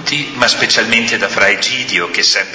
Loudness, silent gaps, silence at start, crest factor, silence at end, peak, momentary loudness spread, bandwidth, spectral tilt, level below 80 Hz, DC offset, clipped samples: -12 LUFS; none; 0 s; 14 dB; 0 s; 0 dBFS; 4 LU; 8 kHz; -1.5 dB/octave; -50 dBFS; under 0.1%; under 0.1%